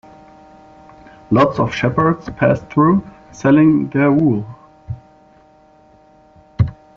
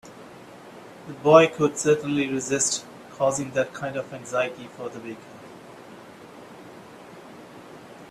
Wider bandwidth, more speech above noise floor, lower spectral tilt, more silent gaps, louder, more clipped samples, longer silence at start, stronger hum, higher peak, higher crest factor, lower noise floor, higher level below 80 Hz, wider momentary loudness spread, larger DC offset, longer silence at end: second, 7.2 kHz vs 13.5 kHz; first, 35 dB vs 21 dB; first, -7 dB/octave vs -4 dB/octave; neither; first, -15 LUFS vs -23 LUFS; neither; first, 1.3 s vs 0.05 s; neither; about the same, -2 dBFS vs -2 dBFS; second, 16 dB vs 24 dB; first, -49 dBFS vs -45 dBFS; first, -44 dBFS vs -66 dBFS; second, 21 LU vs 24 LU; neither; first, 0.25 s vs 0.05 s